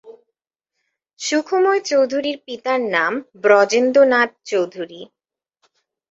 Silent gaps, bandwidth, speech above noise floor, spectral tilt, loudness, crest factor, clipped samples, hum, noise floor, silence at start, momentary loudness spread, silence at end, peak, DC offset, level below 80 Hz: 1.13-1.17 s; 8 kHz; 62 dB; -3 dB/octave; -18 LUFS; 18 dB; under 0.1%; none; -79 dBFS; 0.05 s; 13 LU; 1.05 s; -2 dBFS; under 0.1%; -70 dBFS